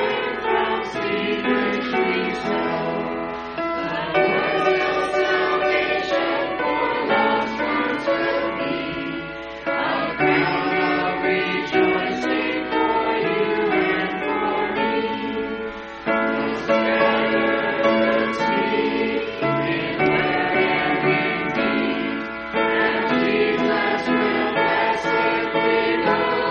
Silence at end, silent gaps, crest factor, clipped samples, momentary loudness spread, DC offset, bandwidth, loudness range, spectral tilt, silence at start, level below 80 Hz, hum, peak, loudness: 0 s; none; 16 dB; under 0.1%; 6 LU; under 0.1%; 7.2 kHz; 3 LU; -2.5 dB/octave; 0 s; -52 dBFS; none; -6 dBFS; -21 LUFS